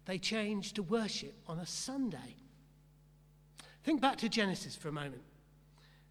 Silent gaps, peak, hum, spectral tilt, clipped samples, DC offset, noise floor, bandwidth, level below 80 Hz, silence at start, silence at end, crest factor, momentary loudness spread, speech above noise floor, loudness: none; -18 dBFS; none; -4 dB/octave; under 0.1%; under 0.1%; -63 dBFS; 14.5 kHz; -66 dBFS; 0.05 s; 0.25 s; 22 dB; 17 LU; 27 dB; -37 LUFS